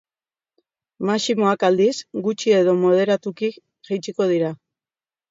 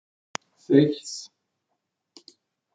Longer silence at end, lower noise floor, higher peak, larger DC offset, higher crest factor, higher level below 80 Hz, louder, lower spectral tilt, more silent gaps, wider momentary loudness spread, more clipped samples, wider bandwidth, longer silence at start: second, 0.75 s vs 1.5 s; first, under -90 dBFS vs -80 dBFS; about the same, -4 dBFS vs -6 dBFS; neither; second, 16 dB vs 22 dB; about the same, -72 dBFS vs -76 dBFS; first, -20 LUFS vs -23 LUFS; about the same, -5.5 dB/octave vs -6 dB/octave; neither; second, 10 LU vs 18 LU; neither; second, 7.8 kHz vs 9.2 kHz; first, 1 s vs 0.7 s